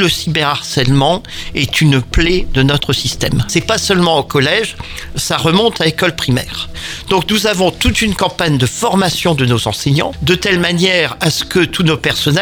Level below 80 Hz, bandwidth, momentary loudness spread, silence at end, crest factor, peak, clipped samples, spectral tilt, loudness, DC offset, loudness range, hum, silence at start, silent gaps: -28 dBFS; 19.5 kHz; 5 LU; 0 s; 14 dB; 0 dBFS; under 0.1%; -4.5 dB/octave; -13 LUFS; under 0.1%; 1 LU; none; 0 s; none